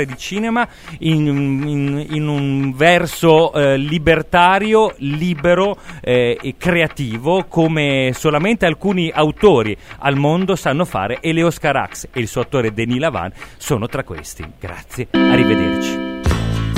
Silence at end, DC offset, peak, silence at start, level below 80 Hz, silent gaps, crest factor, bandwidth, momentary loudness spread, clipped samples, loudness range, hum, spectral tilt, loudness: 0 s; under 0.1%; 0 dBFS; 0 s; -36 dBFS; none; 16 dB; 16 kHz; 11 LU; under 0.1%; 5 LU; none; -6 dB/octave; -16 LUFS